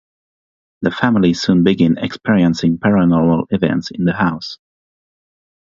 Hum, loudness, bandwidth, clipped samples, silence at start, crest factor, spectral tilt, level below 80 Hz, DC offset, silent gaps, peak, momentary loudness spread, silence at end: none; -15 LUFS; 7.6 kHz; under 0.1%; 0.8 s; 16 dB; -7 dB/octave; -46 dBFS; under 0.1%; none; 0 dBFS; 7 LU; 1.05 s